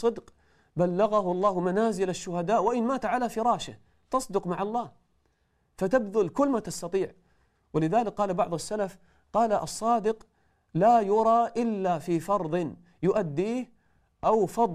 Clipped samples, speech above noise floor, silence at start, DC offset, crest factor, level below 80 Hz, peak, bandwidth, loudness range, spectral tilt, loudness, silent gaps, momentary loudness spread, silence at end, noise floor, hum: under 0.1%; 45 dB; 0 s; under 0.1%; 16 dB; -58 dBFS; -12 dBFS; 14.5 kHz; 4 LU; -6 dB/octave; -27 LUFS; none; 10 LU; 0 s; -71 dBFS; none